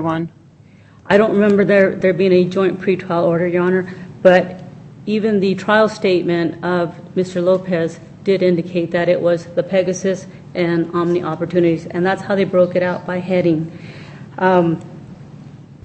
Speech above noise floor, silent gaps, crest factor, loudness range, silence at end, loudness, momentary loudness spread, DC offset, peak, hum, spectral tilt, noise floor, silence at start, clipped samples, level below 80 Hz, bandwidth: 29 dB; none; 16 dB; 3 LU; 0.1 s; -17 LUFS; 14 LU; under 0.1%; 0 dBFS; none; -7 dB/octave; -45 dBFS; 0 s; under 0.1%; -56 dBFS; 8.4 kHz